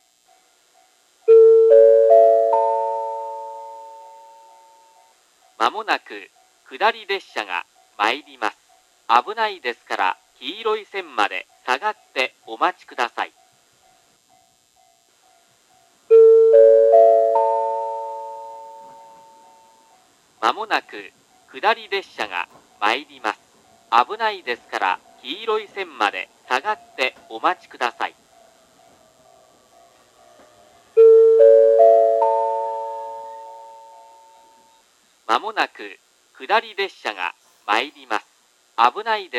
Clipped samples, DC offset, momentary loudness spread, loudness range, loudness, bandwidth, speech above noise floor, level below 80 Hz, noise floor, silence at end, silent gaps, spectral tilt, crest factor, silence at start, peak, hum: under 0.1%; under 0.1%; 21 LU; 14 LU; -18 LUFS; 10.5 kHz; 35 dB; -80 dBFS; -59 dBFS; 0 s; none; -2 dB/octave; 20 dB; 1.25 s; 0 dBFS; none